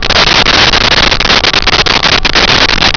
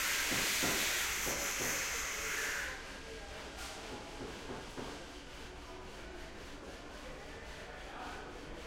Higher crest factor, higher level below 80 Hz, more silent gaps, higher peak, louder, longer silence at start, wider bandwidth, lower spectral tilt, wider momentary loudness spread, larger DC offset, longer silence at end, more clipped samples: second, 8 dB vs 20 dB; first, -20 dBFS vs -54 dBFS; neither; first, 0 dBFS vs -20 dBFS; first, -5 LUFS vs -37 LUFS; about the same, 0 s vs 0 s; second, 5.4 kHz vs 16.5 kHz; first, -2.5 dB/octave vs -1 dB/octave; second, 2 LU vs 17 LU; neither; about the same, 0 s vs 0 s; neither